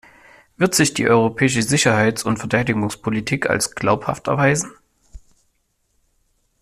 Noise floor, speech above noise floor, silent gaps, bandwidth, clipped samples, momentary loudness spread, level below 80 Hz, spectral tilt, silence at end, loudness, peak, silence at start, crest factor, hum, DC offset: -67 dBFS; 49 dB; none; 14.5 kHz; under 0.1%; 7 LU; -50 dBFS; -4.5 dB/octave; 1.45 s; -18 LUFS; -2 dBFS; 0.6 s; 18 dB; none; under 0.1%